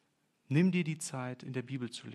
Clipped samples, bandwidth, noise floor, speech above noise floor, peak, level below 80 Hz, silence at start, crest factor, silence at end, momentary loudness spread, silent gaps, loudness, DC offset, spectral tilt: under 0.1%; 13 kHz; -74 dBFS; 40 dB; -18 dBFS; -84 dBFS; 0.5 s; 18 dB; 0 s; 11 LU; none; -34 LUFS; under 0.1%; -6 dB/octave